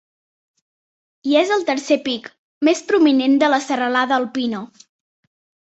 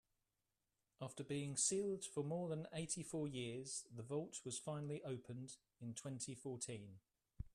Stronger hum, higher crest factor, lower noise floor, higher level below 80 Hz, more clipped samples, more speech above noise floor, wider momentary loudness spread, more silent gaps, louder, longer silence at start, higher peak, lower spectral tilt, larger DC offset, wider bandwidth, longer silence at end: neither; about the same, 18 dB vs 22 dB; about the same, under -90 dBFS vs -90 dBFS; about the same, -68 dBFS vs -72 dBFS; neither; first, over 73 dB vs 43 dB; second, 11 LU vs 14 LU; first, 2.38-2.61 s vs none; first, -18 LUFS vs -46 LUFS; first, 1.25 s vs 1 s; first, -2 dBFS vs -26 dBFS; about the same, -3.5 dB/octave vs -4.5 dB/octave; neither; second, 8.2 kHz vs 13.5 kHz; first, 1 s vs 0.05 s